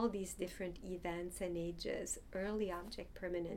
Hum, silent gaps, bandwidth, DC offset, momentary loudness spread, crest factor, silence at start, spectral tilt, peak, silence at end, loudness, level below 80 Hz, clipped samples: none; none; 17.5 kHz; under 0.1%; 6 LU; 16 dB; 0 s; -4.5 dB/octave; -26 dBFS; 0 s; -43 LUFS; -56 dBFS; under 0.1%